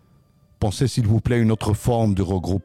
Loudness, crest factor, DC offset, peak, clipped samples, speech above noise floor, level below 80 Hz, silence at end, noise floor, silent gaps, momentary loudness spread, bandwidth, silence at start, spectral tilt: -21 LUFS; 12 dB; under 0.1%; -8 dBFS; under 0.1%; 37 dB; -40 dBFS; 0.05 s; -56 dBFS; none; 4 LU; 14.5 kHz; 0.6 s; -7 dB/octave